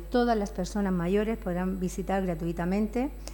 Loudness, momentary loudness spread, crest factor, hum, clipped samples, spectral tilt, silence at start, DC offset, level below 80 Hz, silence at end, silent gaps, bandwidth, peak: -29 LUFS; 5 LU; 14 dB; none; under 0.1%; -6.5 dB/octave; 0 s; under 0.1%; -40 dBFS; 0 s; none; 18 kHz; -14 dBFS